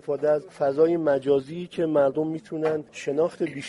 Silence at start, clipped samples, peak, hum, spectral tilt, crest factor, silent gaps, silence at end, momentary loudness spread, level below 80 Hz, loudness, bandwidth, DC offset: 0.05 s; under 0.1%; -10 dBFS; none; -7 dB/octave; 16 dB; none; 0 s; 8 LU; -68 dBFS; -25 LUFS; 11.5 kHz; under 0.1%